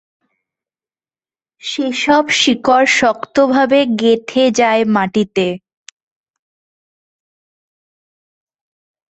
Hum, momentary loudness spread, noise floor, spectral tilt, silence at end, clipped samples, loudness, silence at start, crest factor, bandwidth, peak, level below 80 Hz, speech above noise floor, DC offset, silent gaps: none; 9 LU; under -90 dBFS; -3.5 dB/octave; 3.5 s; under 0.1%; -13 LUFS; 1.65 s; 16 dB; 8.4 kHz; 0 dBFS; -58 dBFS; over 77 dB; under 0.1%; none